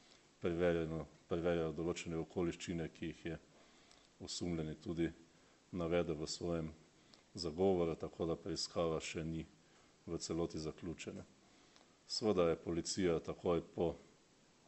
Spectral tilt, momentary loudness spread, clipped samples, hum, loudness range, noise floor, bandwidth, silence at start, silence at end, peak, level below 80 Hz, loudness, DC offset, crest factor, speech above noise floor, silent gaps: -5.5 dB/octave; 12 LU; under 0.1%; none; 5 LU; -69 dBFS; 8.2 kHz; 0.4 s; 0.65 s; -22 dBFS; -62 dBFS; -40 LUFS; under 0.1%; 20 dB; 30 dB; none